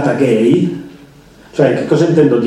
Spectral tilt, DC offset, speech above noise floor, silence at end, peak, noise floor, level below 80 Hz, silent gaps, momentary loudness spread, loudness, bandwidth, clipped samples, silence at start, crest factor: -7.5 dB/octave; under 0.1%; 29 dB; 0 s; 0 dBFS; -41 dBFS; -52 dBFS; none; 11 LU; -13 LUFS; 11 kHz; under 0.1%; 0 s; 12 dB